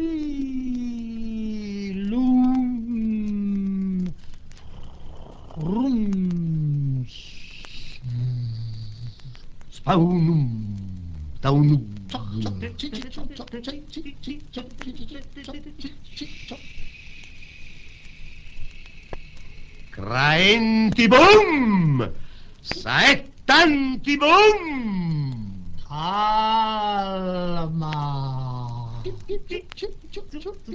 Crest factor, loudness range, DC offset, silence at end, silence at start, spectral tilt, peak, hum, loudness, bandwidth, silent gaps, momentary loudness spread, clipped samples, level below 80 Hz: 20 dB; 21 LU; under 0.1%; 0 s; 0 s; -6 dB/octave; -4 dBFS; none; -21 LUFS; 8 kHz; none; 24 LU; under 0.1%; -42 dBFS